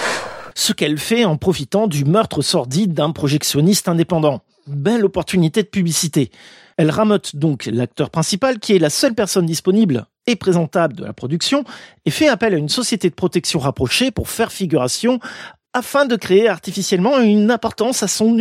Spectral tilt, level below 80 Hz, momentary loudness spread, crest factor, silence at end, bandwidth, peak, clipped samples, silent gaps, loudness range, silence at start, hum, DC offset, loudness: -4.5 dB/octave; -48 dBFS; 7 LU; 16 dB; 0 s; 16 kHz; -2 dBFS; under 0.1%; none; 2 LU; 0 s; none; under 0.1%; -17 LUFS